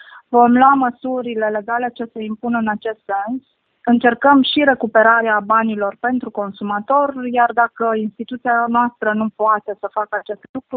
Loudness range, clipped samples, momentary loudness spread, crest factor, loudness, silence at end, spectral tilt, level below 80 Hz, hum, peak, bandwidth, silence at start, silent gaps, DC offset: 4 LU; under 0.1%; 13 LU; 16 dB; -17 LUFS; 0 s; -9.5 dB/octave; -62 dBFS; none; 0 dBFS; 4.6 kHz; 0.1 s; 10.49-10.54 s; under 0.1%